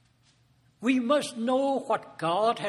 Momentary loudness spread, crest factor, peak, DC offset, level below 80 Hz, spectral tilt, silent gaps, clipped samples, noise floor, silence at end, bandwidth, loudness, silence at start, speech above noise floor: 5 LU; 16 dB; -12 dBFS; under 0.1%; -74 dBFS; -4.5 dB/octave; none; under 0.1%; -64 dBFS; 0 s; 12 kHz; -27 LUFS; 0.8 s; 38 dB